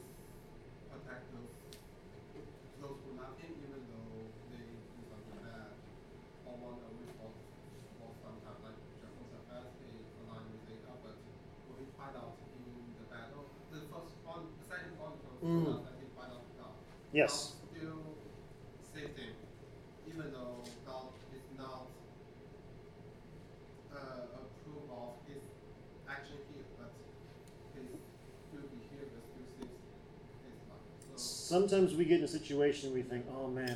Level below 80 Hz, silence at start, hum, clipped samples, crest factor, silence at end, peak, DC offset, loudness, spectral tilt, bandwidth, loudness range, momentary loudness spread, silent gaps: -64 dBFS; 0 s; none; under 0.1%; 28 dB; 0 s; -16 dBFS; under 0.1%; -42 LUFS; -5 dB/octave; 15.5 kHz; 16 LU; 21 LU; none